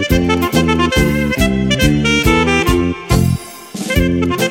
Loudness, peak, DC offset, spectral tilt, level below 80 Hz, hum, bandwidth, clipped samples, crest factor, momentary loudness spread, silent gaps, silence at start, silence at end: -14 LUFS; 0 dBFS; under 0.1%; -5 dB/octave; -24 dBFS; none; 16.5 kHz; under 0.1%; 14 dB; 6 LU; none; 0 s; 0 s